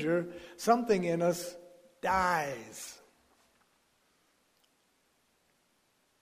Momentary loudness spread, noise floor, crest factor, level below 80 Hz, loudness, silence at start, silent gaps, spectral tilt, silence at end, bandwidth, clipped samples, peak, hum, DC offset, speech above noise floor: 17 LU; -73 dBFS; 24 dB; -64 dBFS; -31 LUFS; 0 s; none; -5 dB/octave; 3.25 s; 15.5 kHz; under 0.1%; -12 dBFS; none; under 0.1%; 42 dB